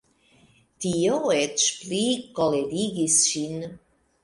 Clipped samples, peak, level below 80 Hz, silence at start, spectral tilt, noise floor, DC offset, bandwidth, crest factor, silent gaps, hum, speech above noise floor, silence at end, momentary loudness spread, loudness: under 0.1%; -6 dBFS; -62 dBFS; 0.8 s; -3 dB/octave; -59 dBFS; under 0.1%; 11.5 kHz; 20 dB; none; none; 35 dB; 0.45 s; 13 LU; -23 LUFS